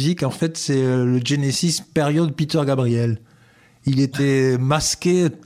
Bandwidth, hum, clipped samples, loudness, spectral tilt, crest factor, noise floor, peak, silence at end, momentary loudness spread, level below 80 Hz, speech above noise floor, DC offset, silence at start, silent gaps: 15 kHz; none; under 0.1%; -20 LUFS; -5.5 dB/octave; 14 dB; -53 dBFS; -6 dBFS; 0.1 s; 4 LU; -50 dBFS; 34 dB; under 0.1%; 0 s; none